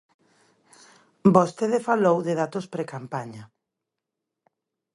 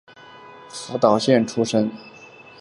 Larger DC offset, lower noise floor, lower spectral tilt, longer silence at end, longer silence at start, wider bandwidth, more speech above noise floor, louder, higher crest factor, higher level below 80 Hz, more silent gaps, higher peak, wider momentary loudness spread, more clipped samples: neither; first, -85 dBFS vs -45 dBFS; first, -7.5 dB/octave vs -5.5 dB/octave; first, 1.5 s vs 0.35 s; first, 1.25 s vs 0.4 s; about the same, 11.5 kHz vs 11.5 kHz; first, 62 dB vs 25 dB; second, -23 LUFS vs -20 LUFS; about the same, 24 dB vs 22 dB; about the same, -68 dBFS vs -64 dBFS; neither; about the same, -2 dBFS vs -2 dBFS; second, 15 LU vs 21 LU; neither